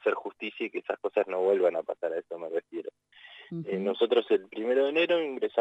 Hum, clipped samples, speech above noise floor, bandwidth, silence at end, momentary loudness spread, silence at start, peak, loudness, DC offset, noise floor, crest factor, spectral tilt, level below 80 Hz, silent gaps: 50 Hz at -80 dBFS; under 0.1%; 26 dB; 8 kHz; 0 s; 14 LU; 0.05 s; -12 dBFS; -29 LUFS; under 0.1%; -53 dBFS; 16 dB; -7 dB/octave; -84 dBFS; none